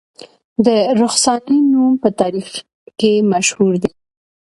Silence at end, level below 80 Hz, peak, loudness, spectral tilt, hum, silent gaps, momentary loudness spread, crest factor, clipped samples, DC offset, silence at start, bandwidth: 0.65 s; -56 dBFS; 0 dBFS; -15 LUFS; -4 dB/octave; none; 2.74-2.86 s; 12 LU; 16 dB; under 0.1%; under 0.1%; 0.6 s; 11.5 kHz